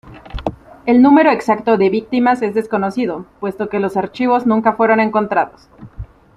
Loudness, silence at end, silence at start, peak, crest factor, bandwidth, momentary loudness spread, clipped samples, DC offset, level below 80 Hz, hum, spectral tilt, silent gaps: -15 LUFS; 0.3 s; 0.05 s; -2 dBFS; 14 dB; 10.5 kHz; 15 LU; under 0.1%; under 0.1%; -42 dBFS; none; -7.5 dB/octave; none